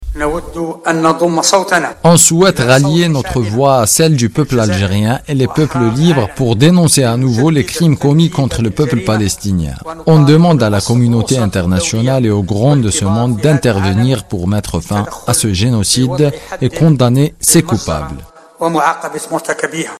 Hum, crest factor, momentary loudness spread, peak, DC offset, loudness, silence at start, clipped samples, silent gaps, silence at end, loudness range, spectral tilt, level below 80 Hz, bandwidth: none; 12 dB; 9 LU; 0 dBFS; under 0.1%; -12 LUFS; 0 s; under 0.1%; none; 0.05 s; 3 LU; -5 dB/octave; -34 dBFS; 15.5 kHz